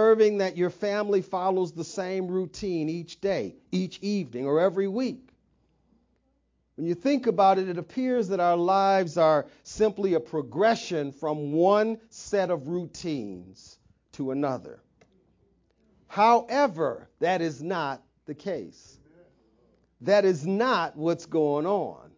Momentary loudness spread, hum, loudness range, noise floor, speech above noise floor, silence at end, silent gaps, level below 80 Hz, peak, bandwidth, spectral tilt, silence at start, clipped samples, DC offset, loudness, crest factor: 12 LU; none; 7 LU; -71 dBFS; 45 dB; 0.2 s; none; -64 dBFS; -8 dBFS; 7.6 kHz; -6 dB/octave; 0 s; under 0.1%; under 0.1%; -26 LUFS; 18 dB